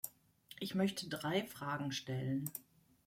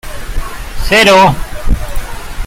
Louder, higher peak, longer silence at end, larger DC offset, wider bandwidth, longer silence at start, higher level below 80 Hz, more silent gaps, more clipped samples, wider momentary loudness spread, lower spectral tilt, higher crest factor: second, -40 LUFS vs -9 LUFS; second, -22 dBFS vs 0 dBFS; first, 0.45 s vs 0 s; neither; about the same, 16.5 kHz vs 16.5 kHz; about the same, 0.05 s vs 0.05 s; second, -76 dBFS vs -18 dBFS; neither; neither; second, 11 LU vs 19 LU; about the same, -5 dB/octave vs -4 dB/octave; first, 20 dB vs 12 dB